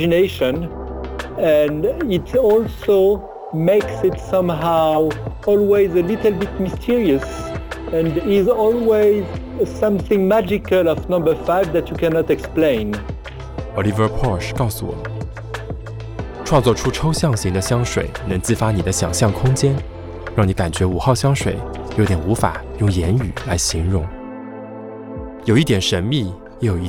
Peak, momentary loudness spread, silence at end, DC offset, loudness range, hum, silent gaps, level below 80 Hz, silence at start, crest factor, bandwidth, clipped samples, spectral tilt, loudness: 0 dBFS; 14 LU; 0 s; under 0.1%; 4 LU; none; none; -34 dBFS; 0 s; 16 dB; over 20 kHz; under 0.1%; -6 dB/octave; -18 LUFS